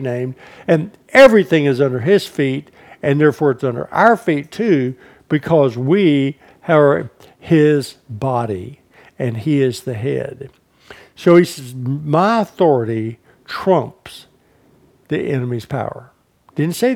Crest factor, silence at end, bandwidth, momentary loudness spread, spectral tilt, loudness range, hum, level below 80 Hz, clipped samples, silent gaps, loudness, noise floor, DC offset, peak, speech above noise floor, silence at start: 16 dB; 0 s; 17 kHz; 15 LU; -7 dB/octave; 8 LU; none; -56 dBFS; under 0.1%; none; -16 LUFS; -53 dBFS; under 0.1%; 0 dBFS; 38 dB; 0 s